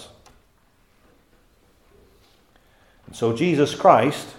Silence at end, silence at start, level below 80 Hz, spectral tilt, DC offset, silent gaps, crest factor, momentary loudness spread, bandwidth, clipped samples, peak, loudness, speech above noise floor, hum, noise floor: 0.05 s; 0 s; -60 dBFS; -6 dB/octave; under 0.1%; none; 22 dB; 11 LU; 16 kHz; under 0.1%; -2 dBFS; -19 LUFS; 42 dB; none; -60 dBFS